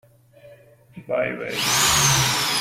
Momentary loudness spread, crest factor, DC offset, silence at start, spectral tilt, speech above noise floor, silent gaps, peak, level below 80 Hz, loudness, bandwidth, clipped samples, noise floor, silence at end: 10 LU; 18 dB; under 0.1%; 0.45 s; -1.5 dB/octave; 29 dB; none; -6 dBFS; -48 dBFS; -19 LUFS; 16.5 kHz; under 0.1%; -49 dBFS; 0 s